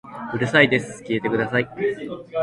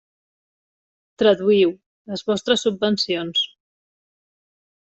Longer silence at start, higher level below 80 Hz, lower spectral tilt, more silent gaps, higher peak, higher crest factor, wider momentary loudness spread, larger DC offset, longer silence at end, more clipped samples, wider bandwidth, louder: second, 0.05 s vs 1.2 s; first, -56 dBFS vs -66 dBFS; about the same, -5.5 dB/octave vs -4.5 dB/octave; second, none vs 1.86-2.05 s; about the same, -2 dBFS vs -4 dBFS; about the same, 20 dB vs 20 dB; about the same, 13 LU vs 12 LU; neither; second, 0 s vs 1.45 s; neither; first, 11.5 kHz vs 8.2 kHz; about the same, -21 LUFS vs -20 LUFS